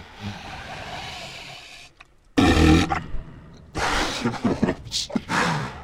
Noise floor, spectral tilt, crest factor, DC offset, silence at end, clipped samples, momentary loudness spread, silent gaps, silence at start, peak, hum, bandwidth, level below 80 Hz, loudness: -52 dBFS; -5 dB/octave; 20 dB; under 0.1%; 0 s; under 0.1%; 21 LU; none; 0 s; -4 dBFS; none; 16 kHz; -34 dBFS; -23 LUFS